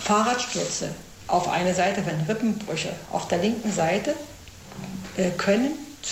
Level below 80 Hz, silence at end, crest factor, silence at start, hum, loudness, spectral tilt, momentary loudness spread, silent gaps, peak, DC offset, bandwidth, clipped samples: -54 dBFS; 0 s; 18 dB; 0 s; none; -25 LUFS; -4.5 dB/octave; 14 LU; none; -8 dBFS; under 0.1%; 16 kHz; under 0.1%